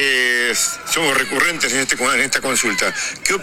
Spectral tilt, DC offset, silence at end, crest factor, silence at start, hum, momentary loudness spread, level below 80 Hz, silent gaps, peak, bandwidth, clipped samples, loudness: -0.5 dB/octave; under 0.1%; 0 s; 18 dB; 0 s; none; 4 LU; -50 dBFS; none; 0 dBFS; 18 kHz; under 0.1%; -16 LUFS